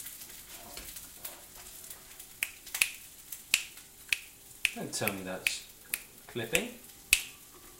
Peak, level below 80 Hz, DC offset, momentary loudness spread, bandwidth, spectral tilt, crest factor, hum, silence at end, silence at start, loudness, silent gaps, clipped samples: -2 dBFS; -62 dBFS; under 0.1%; 17 LU; 17 kHz; -1 dB/octave; 36 dB; none; 0 s; 0 s; -33 LUFS; none; under 0.1%